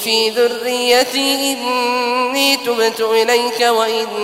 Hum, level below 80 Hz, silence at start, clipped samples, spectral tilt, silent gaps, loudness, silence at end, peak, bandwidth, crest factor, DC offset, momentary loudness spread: none; -64 dBFS; 0 s; under 0.1%; -1 dB/octave; none; -15 LUFS; 0 s; 0 dBFS; 16 kHz; 16 dB; under 0.1%; 4 LU